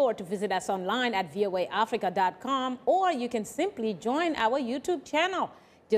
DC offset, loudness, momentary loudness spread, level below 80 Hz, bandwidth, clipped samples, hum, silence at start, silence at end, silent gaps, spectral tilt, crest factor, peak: under 0.1%; -29 LUFS; 5 LU; -68 dBFS; 15.5 kHz; under 0.1%; none; 0 s; 0 s; none; -4 dB/octave; 16 dB; -14 dBFS